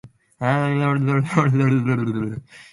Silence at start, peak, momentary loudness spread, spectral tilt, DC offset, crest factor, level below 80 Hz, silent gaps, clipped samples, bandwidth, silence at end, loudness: 0.05 s; -4 dBFS; 9 LU; -8 dB/octave; under 0.1%; 16 dB; -56 dBFS; none; under 0.1%; 11.5 kHz; 0.1 s; -20 LUFS